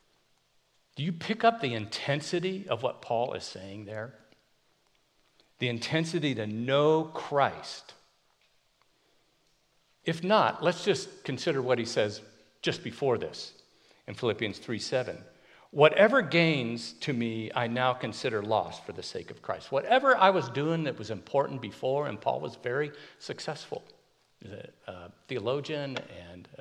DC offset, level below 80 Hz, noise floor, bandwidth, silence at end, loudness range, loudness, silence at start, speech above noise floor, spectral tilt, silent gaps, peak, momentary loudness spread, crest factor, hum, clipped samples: under 0.1%; -74 dBFS; -70 dBFS; 11.5 kHz; 0.05 s; 9 LU; -29 LUFS; 0.95 s; 40 dB; -5.5 dB/octave; none; -6 dBFS; 18 LU; 24 dB; none; under 0.1%